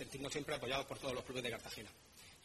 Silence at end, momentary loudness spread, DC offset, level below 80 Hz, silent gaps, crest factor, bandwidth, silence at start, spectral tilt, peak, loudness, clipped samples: 0 s; 16 LU; under 0.1%; -66 dBFS; none; 20 dB; 13.5 kHz; 0 s; -3.5 dB/octave; -24 dBFS; -43 LUFS; under 0.1%